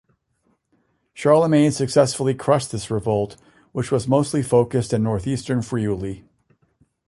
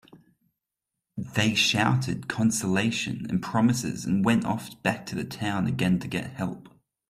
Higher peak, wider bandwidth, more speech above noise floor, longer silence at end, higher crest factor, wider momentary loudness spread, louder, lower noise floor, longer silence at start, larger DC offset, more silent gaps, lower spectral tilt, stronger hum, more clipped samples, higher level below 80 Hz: first, -2 dBFS vs -8 dBFS; second, 11.5 kHz vs 15 kHz; second, 48 dB vs 60 dB; first, 0.9 s vs 0.4 s; about the same, 18 dB vs 20 dB; about the same, 11 LU vs 12 LU; first, -20 LUFS vs -26 LUFS; second, -67 dBFS vs -86 dBFS; first, 1.15 s vs 0.15 s; neither; neither; first, -6.5 dB/octave vs -4.5 dB/octave; neither; neither; first, -50 dBFS vs -58 dBFS